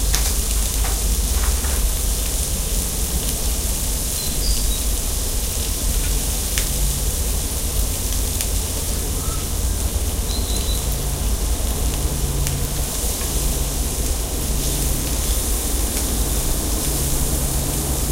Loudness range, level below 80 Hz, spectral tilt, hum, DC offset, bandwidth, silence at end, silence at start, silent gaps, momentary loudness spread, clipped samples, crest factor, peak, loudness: 2 LU; -22 dBFS; -3 dB/octave; none; 0.1%; 16 kHz; 0 s; 0 s; none; 2 LU; under 0.1%; 20 dB; 0 dBFS; -21 LUFS